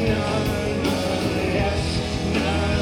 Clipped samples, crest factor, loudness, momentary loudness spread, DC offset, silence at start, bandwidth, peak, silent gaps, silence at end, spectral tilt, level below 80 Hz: under 0.1%; 12 dB; -23 LUFS; 2 LU; under 0.1%; 0 s; 18 kHz; -10 dBFS; none; 0 s; -5.5 dB/octave; -32 dBFS